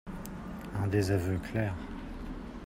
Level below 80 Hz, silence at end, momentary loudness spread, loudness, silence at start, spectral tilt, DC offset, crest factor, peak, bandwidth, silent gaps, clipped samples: -46 dBFS; 0 s; 13 LU; -34 LUFS; 0.05 s; -7 dB/octave; under 0.1%; 18 dB; -16 dBFS; 16 kHz; none; under 0.1%